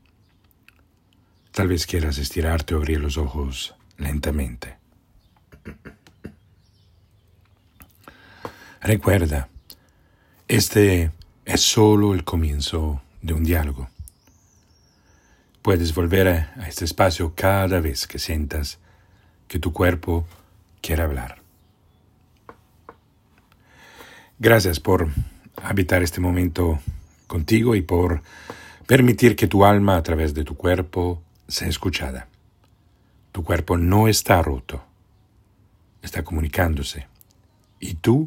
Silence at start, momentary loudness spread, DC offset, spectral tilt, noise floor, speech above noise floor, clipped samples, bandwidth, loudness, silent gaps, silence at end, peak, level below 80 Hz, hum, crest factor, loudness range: 1.55 s; 20 LU; under 0.1%; -5.5 dB/octave; -59 dBFS; 39 dB; under 0.1%; 17 kHz; -21 LUFS; none; 0 s; 0 dBFS; -36 dBFS; none; 22 dB; 10 LU